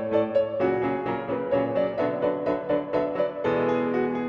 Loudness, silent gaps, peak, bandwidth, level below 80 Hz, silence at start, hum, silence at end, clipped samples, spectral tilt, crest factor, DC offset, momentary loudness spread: -26 LUFS; none; -10 dBFS; 6.6 kHz; -58 dBFS; 0 s; none; 0 s; under 0.1%; -8.5 dB/octave; 14 dB; under 0.1%; 3 LU